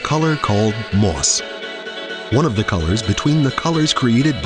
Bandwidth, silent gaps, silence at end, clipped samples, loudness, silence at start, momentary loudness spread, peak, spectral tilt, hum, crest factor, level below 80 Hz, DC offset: 10.5 kHz; none; 0 s; under 0.1%; -18 LUFS; 0 s; 12 LU; -2 dBFS; -4.5 dB/octave; none; 16 dB; -36 dBFS; under 0.1%